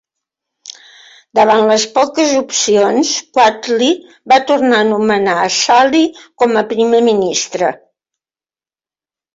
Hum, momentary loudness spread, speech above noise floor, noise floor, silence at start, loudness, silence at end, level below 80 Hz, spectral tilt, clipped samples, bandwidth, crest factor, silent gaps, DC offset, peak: none; 8 LU; over 78 dB; under -90 dBFS; 0.65 s; -12 LUFS; 1.6 s; -60 dBFS; -2.5 dB/octave; under 0.1%; 7.8 kHz; 12 dB; none; under 0.1%; 0 dBFS